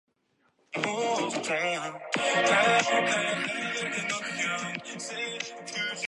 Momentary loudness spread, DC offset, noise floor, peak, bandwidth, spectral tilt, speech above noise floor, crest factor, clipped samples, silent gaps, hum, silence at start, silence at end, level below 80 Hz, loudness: 12 LU; under 0.1%; -71 dBFS; -10 dBFS; 11.5 kHz; -2.5 dB/octave; 43 dB; 20 dB; under 0.1%; none; none; 0.7 s; 0 s; -80 dBFS; -28 LUFS